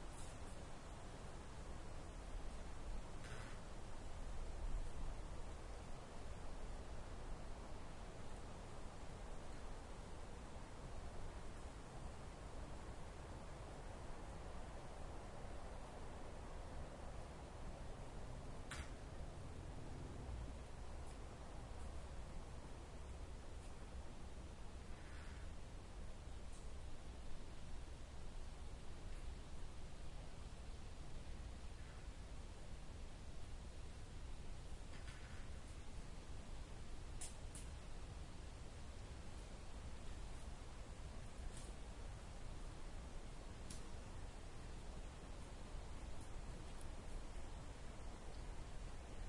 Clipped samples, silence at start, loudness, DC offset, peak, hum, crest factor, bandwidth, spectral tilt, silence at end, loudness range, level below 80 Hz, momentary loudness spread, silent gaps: under 0.1%; 0 s; -55 LUFS; under 0.1%; -34 dBFS; none; 16 dB; 11.5 kHz; -5 dB/octave; 0 s; 3 LU; -52 dBFS; 3 LU; none